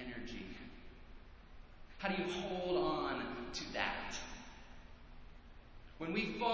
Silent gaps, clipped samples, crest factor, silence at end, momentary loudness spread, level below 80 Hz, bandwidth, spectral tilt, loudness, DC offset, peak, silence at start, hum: none; under 0.1%; 22 dB; 0 s; 24 LU; -58 dBFS; 8 kHz; -4.5 dB/octave; -40 LUFS; under 0.1%; -20 dBFS; 0 s; none